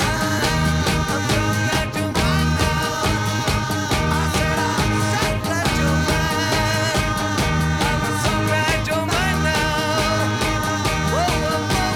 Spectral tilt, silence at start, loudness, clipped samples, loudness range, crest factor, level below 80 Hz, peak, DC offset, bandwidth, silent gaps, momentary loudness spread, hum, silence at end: -4.5 dB/octave; 0 s; -19 LUFS; under 0.1%; 1 LU; 16 dB; -30 dBFS; -4 dBFS; under 0.1%; 19.5 kHz; none; 2 LU; none; 0 s